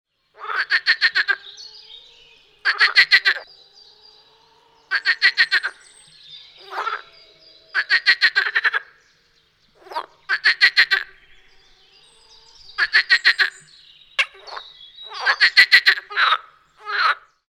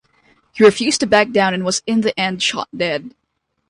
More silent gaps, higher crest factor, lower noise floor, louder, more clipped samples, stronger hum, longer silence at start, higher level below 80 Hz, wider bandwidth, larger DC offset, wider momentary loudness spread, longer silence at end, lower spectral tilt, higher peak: neither; first, 22 dB vs 16 dB; about the same, -60 dBFS vs -57 dBFS; about the same, -17 LUFS vs -16 LUFS; neither; neither; second, 0.4 s vs 0.55 s; second, -66 dBFS vs -56 dBFS; first, 16.5 kHz vs 11 kHz; neither; first, 20 LU vs 8 LU; second, 0.35 s vs 0.6 s; second, 2 dB/octave vs -3.5 dB/octave; about the same, 0 dBFS vs 0 dBFS